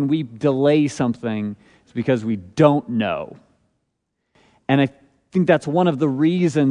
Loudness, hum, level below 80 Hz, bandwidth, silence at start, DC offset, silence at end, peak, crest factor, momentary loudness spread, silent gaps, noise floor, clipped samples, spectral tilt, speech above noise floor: -20 LUFS; none; -60 dBFS; 10.5 kHz; 0 s; under 0.1%; 0 s; -2 dBFS; 18 dB; 12 LU; none; -75 dBFS; under 0.1%; -7.5 dB/octave; 56 dB